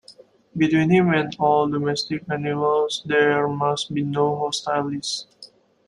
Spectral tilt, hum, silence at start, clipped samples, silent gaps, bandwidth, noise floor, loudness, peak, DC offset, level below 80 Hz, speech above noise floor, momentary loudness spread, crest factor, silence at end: -5.5 dB/octave; none; 0.1 s; under 0.1%; none; 11.5 kHz; -50 dBFS; -21 LUFS; -6 dBFS; under 0.1%; -60 dBFS; 29 dB; 8 LU; 16 dB; 0.4 s